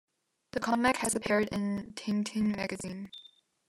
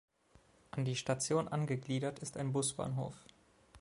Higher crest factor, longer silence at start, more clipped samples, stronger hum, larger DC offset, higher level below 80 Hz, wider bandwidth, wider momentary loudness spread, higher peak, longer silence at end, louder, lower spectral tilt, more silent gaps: about the same, 18 dB vs 20 dB; second, 0.55 s vs 0.75 s; neither; neither; neither; first, -64 dBFS vs -70 dBFS; first, 13 kHz vs 11.5 kHz; first, 13 LU vs 9 LU; first, -14 dBFS vs -18 dBFS; first, 0.4 s vs 0 s; first, -31 LUFS vs -37 LUFS; about the same, -4.5 dB/octave vs -5 dB/octave; neither